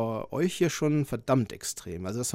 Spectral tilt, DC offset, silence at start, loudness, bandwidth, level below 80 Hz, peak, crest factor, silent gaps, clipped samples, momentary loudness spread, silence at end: -5.5 dB/octave; under 0.1%; 0 s; -29 LUFS; 16 kHz; -56 dBFS; -12 dBFS; 18 dB; none; under 0.1%; 8 LU; 0 s